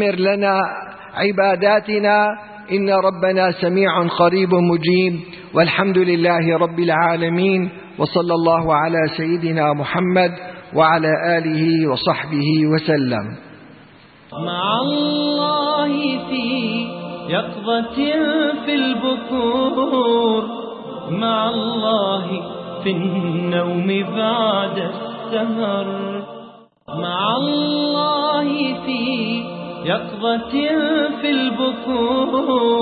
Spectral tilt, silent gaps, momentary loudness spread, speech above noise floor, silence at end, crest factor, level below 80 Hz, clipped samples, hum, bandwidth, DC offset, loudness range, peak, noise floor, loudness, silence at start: -11 dB/octave; none; 9 LU; 28 dB; 0 s; 16 dB; -56 dBFS; under 0.1%; none; 4.8 kHz; under 0.1%; 4 LU; -2 dBFS; -46 dBFS; -18 LUFS; 0 s